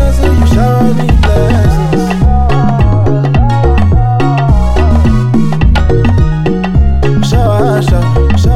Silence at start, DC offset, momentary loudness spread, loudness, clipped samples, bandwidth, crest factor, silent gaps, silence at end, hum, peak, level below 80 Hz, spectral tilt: 0 s; 4%; 2 LU; -10 LUFS; under 0.1%; 13 kHz; 8 dB; none; 0 s; none; 0 dBFS; -12 dBFS; -7.5 dB/octave